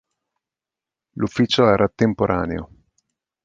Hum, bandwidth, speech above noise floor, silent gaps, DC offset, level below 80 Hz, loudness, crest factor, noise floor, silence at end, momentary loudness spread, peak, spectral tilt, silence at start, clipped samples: none; 9 kHz; 70 dB; none; under 0.1%; -46 dBFS; -19 LUFS; 20 dB; -89 dBFS; 0.8 s; 13 LU; -2 dBFS; -6.5 dB/octave; 1.15 s; under 0.1%